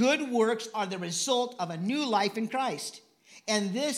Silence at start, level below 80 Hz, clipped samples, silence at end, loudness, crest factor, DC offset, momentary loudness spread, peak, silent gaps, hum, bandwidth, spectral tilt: 0 s; -86 dBFS; under 0.1%; 0 s; -29 LUFS; 16 dB; under 0.1%; 7 LU; -14 dBFS; none; none; 15.5 kHz; -3.5 dB/octave